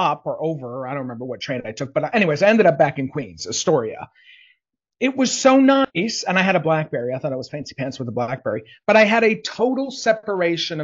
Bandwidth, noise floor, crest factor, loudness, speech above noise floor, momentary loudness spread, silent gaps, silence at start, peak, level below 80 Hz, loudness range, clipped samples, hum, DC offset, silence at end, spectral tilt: 7.8 kHz; -64 dBFS; 18 dB; -20 LUFS; 45 dB; 14 LU; none; 0 s; -2 dBFS; -64 dBFS; 2 LU; under 0.1%; none; under 0.1%; 0 s; -4.5 dB/octave